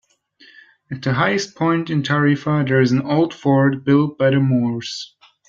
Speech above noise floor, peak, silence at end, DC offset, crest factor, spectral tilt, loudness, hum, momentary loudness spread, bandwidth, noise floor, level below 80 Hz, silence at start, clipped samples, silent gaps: 34 dB; -2 dBFS; 0.45 s; under 0.1%; 16 dB; -7 dB/octave; -18 LUFS; none; 10 LU; 7.6 kHz; -51 dBFS; -58 dBFS; 0.9 s; under 0.1%; none